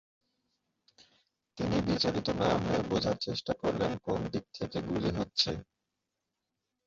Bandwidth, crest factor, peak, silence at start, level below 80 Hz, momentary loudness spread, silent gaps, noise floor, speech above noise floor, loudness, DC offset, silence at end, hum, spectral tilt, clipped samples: 7.8 kHz; 22 dB; -12 dBFS; 1.55 s; -54 dBFS; 8 LU; none; -86 dBFS; 54 dB; -32 LUFS; under 0.1%; 1.25 s; none; -5.5 dB/octave; under 0.1%